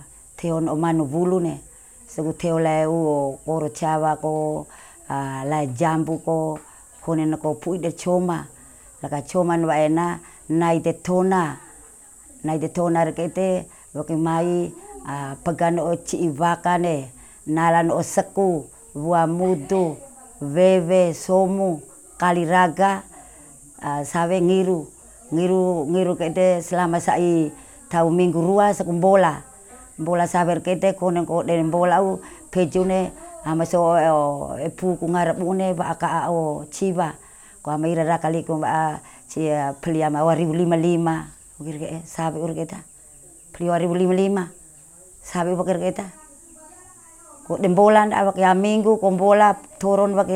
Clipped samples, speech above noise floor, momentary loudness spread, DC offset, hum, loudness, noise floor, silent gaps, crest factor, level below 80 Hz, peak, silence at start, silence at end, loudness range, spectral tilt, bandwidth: under 0.1%; 27 dB; 13 LU; under 0.1%; none; -21 LUFS; -47 dBFS; none; 18 dB; -54 dBFS; -4 dBFS; 0 s; 0 s; 5 LU; -6.5 dB/octave; 15 kHz